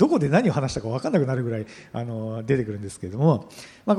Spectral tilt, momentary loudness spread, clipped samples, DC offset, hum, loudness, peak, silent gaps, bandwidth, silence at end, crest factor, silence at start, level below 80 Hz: -7.5 dB/octave; 13 LU; under 0.1%; under 0.1%; none; -25 LUFS; -6 dBFS; none; 11.5 kHz; 0 s; 18 dB; 0 s; -54 dBFS